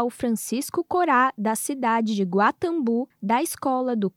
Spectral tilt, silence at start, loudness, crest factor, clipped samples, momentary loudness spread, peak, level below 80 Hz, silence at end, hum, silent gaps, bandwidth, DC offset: -4.5 dB/octave; 0 s; -23 LUFS; 16 dB; under 0.1%; 6 LU; -8 dBFS; -66 dBFS; 0.1 s; none; none; 17.5 kHz; under 0.1%